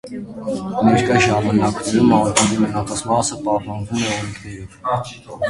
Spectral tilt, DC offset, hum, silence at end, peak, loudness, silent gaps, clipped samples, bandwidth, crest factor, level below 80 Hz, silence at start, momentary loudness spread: -4.5 dB/octave; under 0.1%; none; 0 s; 0 dBFS; -18 LUFS; none; under 0.1%; 11.5 kHz; 18 dB; -44 dBFS; 0.05 s; 14 LU